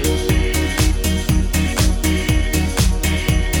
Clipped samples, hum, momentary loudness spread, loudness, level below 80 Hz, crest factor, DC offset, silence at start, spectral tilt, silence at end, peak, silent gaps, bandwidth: under 0.1%; none; 2 LU; -18 LUFS; -20 dBFS; 12 dB; under 0.1%; 0 s; -4.5 dB/octave; 0 s; -4 dBFS; none; over 20 kHz